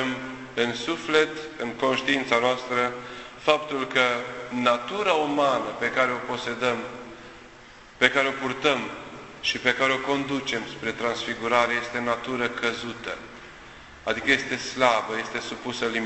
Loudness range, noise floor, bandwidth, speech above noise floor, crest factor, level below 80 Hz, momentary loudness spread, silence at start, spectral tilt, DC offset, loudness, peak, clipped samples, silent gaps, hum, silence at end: 3 LU; -48 dBFS; 8.4 kHz; 22 dB; 24 dB; -58 dBFS; 13 LU; 0 s; -3.5 dB/octave; under 0.1%; -25 LUFS; -2 dBFS; under 0.1%; none; none; 0 s